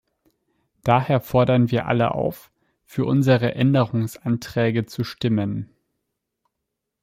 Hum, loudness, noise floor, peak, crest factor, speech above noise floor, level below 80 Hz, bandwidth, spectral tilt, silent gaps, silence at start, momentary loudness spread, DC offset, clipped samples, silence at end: none; -21 LUFS; -81 dBFS; -2 dBFS; 20 dB; 61 dB; -54 dBFS; 16 kHz; -7.5 dB/octave; none; 0.85 s; 11 LU; under 0.1%; under 0.1%; 1.35 s